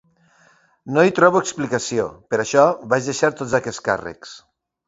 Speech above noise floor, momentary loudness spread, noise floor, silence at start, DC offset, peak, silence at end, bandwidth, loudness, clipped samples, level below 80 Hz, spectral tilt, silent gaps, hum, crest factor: 37 dB; 10 LU; -56 dBFS; 0.85 s; under 0.1%; 0 dBFS; 0.5 s; 8 kHz; -19 LUFS; under 0.1%; -58 dBFS; -4.5 dB/octave; none; none; 20 dB